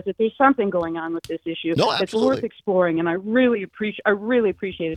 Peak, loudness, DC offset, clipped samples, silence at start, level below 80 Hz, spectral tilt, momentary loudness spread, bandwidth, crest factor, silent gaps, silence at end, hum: 0 dBFS; -21 LUFS; under 0.1%; under 0.1%; 0.05 s; -60 dBFS; -6 dB/octave; 10 LU; 13 kHz; 20 dB; none; 0 s; none